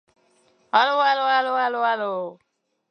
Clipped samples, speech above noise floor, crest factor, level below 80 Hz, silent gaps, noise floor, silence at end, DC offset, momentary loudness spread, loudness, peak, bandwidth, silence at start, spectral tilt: under 0.1%; 41 dB; 18 dB; -84 dBFS; none; -62 dBFS; 0.6 s; under 0.1%; 10 LU; -21 LUFS; -4 dBFS; 6.4 kHz; 0.75 s; -3.5 dB/octave